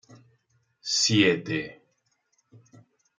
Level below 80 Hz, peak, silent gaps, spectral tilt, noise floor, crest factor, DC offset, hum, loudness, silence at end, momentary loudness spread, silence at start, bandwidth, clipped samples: -68 dBFS; -6 dBFS; none; -3.5 dB/octave; -73 dBFS; 24 dB; under 0.1%; none; -23 LUFS; 1.45 s; 18 LU; 0.85 s; 9.6 kHz; under 0.1%